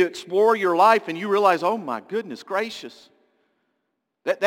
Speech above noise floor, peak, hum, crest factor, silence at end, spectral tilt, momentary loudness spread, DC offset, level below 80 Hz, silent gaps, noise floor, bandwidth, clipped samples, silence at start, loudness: 56 dB; -4 dBFS; none; 20 dB; 0 s; -4.5 dB/octave; 14 LU; under 0.1%; -78 dBFS; none; -77 dBFS; 17 kHz; under 0.1%; 0 s; -21 LUFS